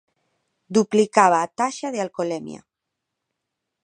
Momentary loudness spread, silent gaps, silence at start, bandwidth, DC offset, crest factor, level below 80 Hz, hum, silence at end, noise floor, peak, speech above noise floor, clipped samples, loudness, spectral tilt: 11 LU; none; 0.7 s; 10.5 kHz; under 0.1%; 22 dB; -74 dBFS; none; 1.25 s; -82 dBFS; 0 dBFS; 61 dB; under 0.1%; -21 LUFS; -4.5 dB/octave